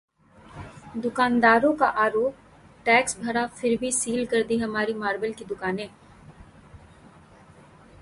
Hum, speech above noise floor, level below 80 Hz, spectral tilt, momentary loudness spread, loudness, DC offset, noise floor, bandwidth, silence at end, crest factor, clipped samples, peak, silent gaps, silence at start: none; 28 dB; -56 dBFS; -3.5 dB/octave; 14 LU; -24 LUFS; under 0.1%; -51 dBFS; 11.5 kHz; 1.25 s; 20 dB; under 0.1%; -6 dBFS; none; 0.55 s